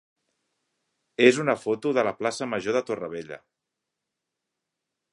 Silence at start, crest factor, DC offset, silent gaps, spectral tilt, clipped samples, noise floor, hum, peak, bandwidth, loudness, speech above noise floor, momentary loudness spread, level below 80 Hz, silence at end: 1.2 s; 24 dB; under 0.1%; none; -4.5 dB/octave; under 0.1%; -84 dBFS; none; -4 dBFS; 11.5 kHz; -25 LUFS; 60 dB; 19 LU; -72 dBFS; 1.75 s